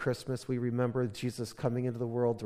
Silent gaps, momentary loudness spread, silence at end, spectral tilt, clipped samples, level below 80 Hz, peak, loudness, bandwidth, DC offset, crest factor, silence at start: none; 5 LU; 0 s; -7 dB/octave; under 0.1%; -64 dBFS; -16 dBFS; -34 LUFS; 15 kHz; under 0.1%; 16 dB; 0 s